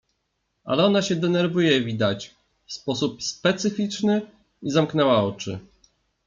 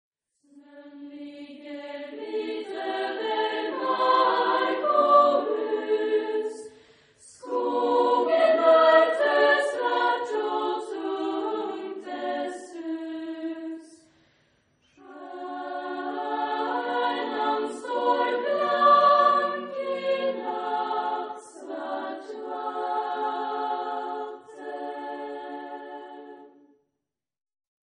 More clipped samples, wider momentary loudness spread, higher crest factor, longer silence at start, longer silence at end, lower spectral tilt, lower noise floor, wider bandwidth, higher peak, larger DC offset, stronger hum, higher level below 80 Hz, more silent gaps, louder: neither; second, 14 LU vs 20 LU; about the same, 18 dB vs 20 dB; about the same, 0.65 s vs 0.55 s; second, 0.65 s vs 1.45 s; first, -5 dB/octave vs -3.5 dB/octave; second, -75 dBFS vs -85 dBFS; second, 7.6 kHz vs 10 kHz; about the same, -6 dBFS vs -6 dBFS; neither; neither; first, -62 dBFS vs -82 dBFS; neither; about the same, -23 LUFS vs -25 LUFS